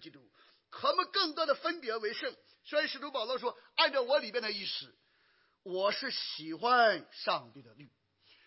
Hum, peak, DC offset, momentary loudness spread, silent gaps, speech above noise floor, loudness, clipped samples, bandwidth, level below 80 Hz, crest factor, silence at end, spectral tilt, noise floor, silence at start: none; -12 dBFS; under 0.1%; 11 LU; none; 38 dB; -32 LUFS; under 0.1%; 5.8 kHz; under -90 dBFS; 22 dB; 0.6 s; -5.5 dB/octave; -71 dBFS; 0 s